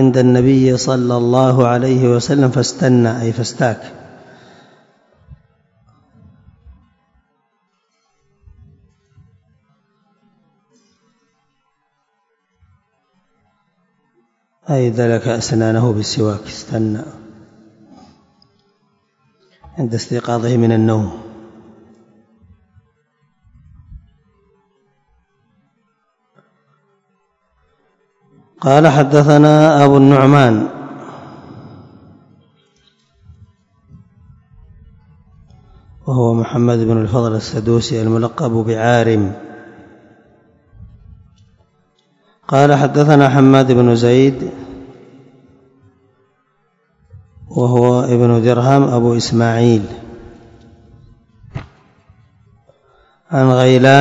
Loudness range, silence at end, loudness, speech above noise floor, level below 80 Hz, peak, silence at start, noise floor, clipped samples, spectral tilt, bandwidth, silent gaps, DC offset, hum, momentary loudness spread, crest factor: 14 LU; 0 s; -13 LUFS; 54 dB; -50 dBFS; 0 dBFS; 0 s; -66 dBFS; 0.2%; -7 dB/octave; 8 kHz; none; under 0.1%; none; 24 LU; 16 dB